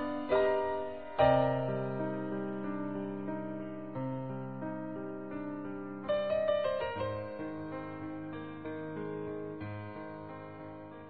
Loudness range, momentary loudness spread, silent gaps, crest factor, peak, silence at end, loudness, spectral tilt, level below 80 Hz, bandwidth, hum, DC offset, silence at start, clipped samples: 9 LU; 13 LU; none; 20 dB; -16 dBFS; 0 s; -35 LUFS; -6 dB/octave; -60 dBFS; 4.6 kHz; none; 0.2%; 0 s; under 0.1%